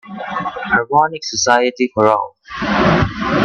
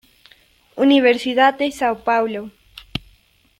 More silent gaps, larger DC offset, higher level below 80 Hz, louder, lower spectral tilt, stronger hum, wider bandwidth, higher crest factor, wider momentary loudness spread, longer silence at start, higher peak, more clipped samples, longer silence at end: neither; neither; first, -38 dBFS vs -54 dBFS; about the same, -16 LUFS vs -17 LUFS; about the same, -4.5 dB/octave vs -4.5 dB/octave; neither; second, 9 kHz vs 13.5 kHz; about the same, 16 dB vs 18 dB; second, 9 LU vs 17 LU; second, 0.05 s vs 0.75 s; about the same, 0 dBFS vs -2 dBFS; neither; second, 0 s vs 0.6 s